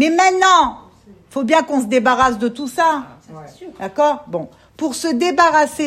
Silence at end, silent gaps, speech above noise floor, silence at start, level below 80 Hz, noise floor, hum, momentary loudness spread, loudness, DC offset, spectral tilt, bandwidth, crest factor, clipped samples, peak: 0 s; none; 29 dB; 0 s; -50 dBFS; -45 dBFS; none; 16 LU; -16 LUFS; under 0.1%; -3 dB/octave; 14.5 kHz; 16 dB; under 0.1%; 0 dBFS